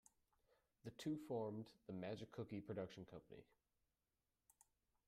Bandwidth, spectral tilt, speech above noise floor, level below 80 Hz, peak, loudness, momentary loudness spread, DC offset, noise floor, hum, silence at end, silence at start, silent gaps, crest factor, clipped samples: 14.5 kHz; -6.5 dB/octave; over 39 dB; -82 dBFS; -34 dBFS; -52 LUFS; 14 LU; under 0.1%; under -90 dBFS; none; 1.65 s; 0.85 s; none; 18 dB; under 0.1%